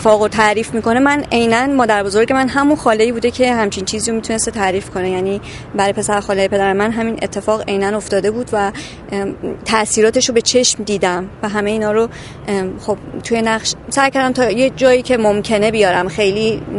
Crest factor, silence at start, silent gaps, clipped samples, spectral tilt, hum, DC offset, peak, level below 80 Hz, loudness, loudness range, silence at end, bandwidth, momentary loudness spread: 16 dB; 0 s; none; under 0.1%; -3.5 dB/octave; none; under 0.1%; 0 dBFS; -40 dBFS; -15 LUFS; 4 LU; 0 s; 11.5 kHz; 9 LU